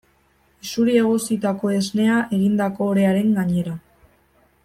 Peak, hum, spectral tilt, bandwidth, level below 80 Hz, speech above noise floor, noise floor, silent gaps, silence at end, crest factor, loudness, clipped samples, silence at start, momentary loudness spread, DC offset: -6 dBFS; none; -6 dB/octave; 15.5 kHz; -58 dBFS; 41 dB; -60 dBFS; none; 0.85 s; 16 dB; -20 LUFS; under 0.1%; 0.65 s; 9 LU; under 0.1%